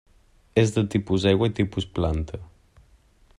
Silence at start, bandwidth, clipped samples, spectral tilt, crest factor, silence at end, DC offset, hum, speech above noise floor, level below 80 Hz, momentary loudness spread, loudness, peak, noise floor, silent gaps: 0.55 s; 11 kHz; under 0.1%; -6.5 dB/octave; 18 dB; 0.95 s; under 0.1%; none; 34 dB; -42 dBFS; 9 LU; -24 LUFS; -6 dBFS; -57 dBFS; none